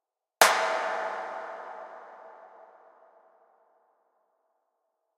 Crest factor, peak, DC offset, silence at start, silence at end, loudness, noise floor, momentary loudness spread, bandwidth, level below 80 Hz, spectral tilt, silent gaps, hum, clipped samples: 30 dB; -4 dBFS; under 0.1%; 0.4 s; 2.55 s; -26 LUFS; -79 dBFS; 27 LU; 15.5 kHz; -74 dBFS; 1 dB/octave; none; none; under 0.1%